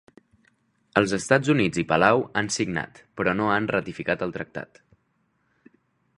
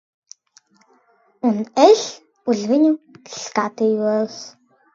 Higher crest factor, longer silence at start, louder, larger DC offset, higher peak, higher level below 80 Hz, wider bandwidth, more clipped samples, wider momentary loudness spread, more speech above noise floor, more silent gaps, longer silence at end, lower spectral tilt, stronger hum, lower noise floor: about the same, 24 dB vs 20 dB; second, 0.95 s vs 1.45 s; second, -24 LUFS vs -19 LUFS; neither; about the same, -2 dBFS vs 0 dBFS; first, -56 dBFS vs -72 dBFS; first, 11.5 kHz vs 7.8 kHz; neither; second, 14 LU vs 18 LU; first, 46 dB vs 41 dB; neither; first, 1.55 s vs 0.45 s; about the same, -5 dB/octave vs -4.5 dB/octave; neither; first, -70 dBFS vs -58 dBFS